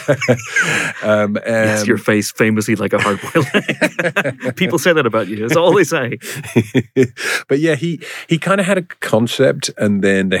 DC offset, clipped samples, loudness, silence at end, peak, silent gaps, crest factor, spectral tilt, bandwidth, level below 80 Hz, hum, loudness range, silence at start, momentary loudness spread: under 0.1%; under 0.1%; -16 LUFS; 0 s; -2 dBFS; none; 14 dB; -5 dB/octave; 18.5 kHz; -62 dBFS; none; 1 LU; 0 s; 6 LU